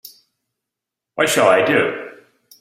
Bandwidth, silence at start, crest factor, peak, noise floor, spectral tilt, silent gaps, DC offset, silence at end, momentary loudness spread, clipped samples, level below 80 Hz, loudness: 16 kHz; 0.05 s; 18 dB; -2 dBFS; -84 dBFS; -3.5 dB/octave; none; under 0.1%; 0.5 s; 20 LU; under 0.1%; -64 dBFS; -16 LUFS